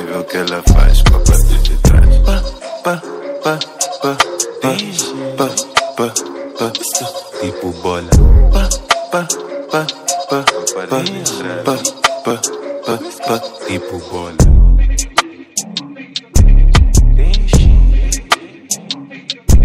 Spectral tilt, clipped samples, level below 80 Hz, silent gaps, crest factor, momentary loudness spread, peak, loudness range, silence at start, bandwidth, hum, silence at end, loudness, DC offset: -4 dB/octave; under 0.1%; -12 dBFS; none; 12 dB; 11 LU; 0 dBFS; 4 LU; 0 s; 15.5 kHz; none; 0 s; -15 LUFS; under 0.1%